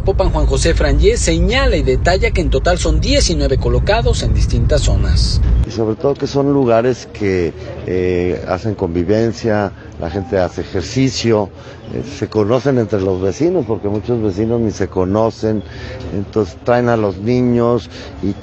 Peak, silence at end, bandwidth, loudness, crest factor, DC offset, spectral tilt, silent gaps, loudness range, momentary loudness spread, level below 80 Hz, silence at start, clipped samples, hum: 0 dBFS; 0 s; 9.8 kHz; -16 LUFS; 14 dB; under 0.1%; -6 dB/octave; none; 4 LU; 9 LU; -20 dBFS; 0 s; under 0.1%; none